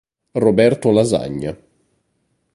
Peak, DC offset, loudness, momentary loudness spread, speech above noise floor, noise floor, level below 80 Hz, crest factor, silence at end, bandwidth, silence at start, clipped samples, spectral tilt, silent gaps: 0 dBFS; under 0.1%; -17 LUFS; 13 LU; 52 dB; -67 dBFS; -50 dBFS; 18 dB; 1 s; 11.5 kHz; 0.35 s; under 0.1%; -6.5 dB/octave; none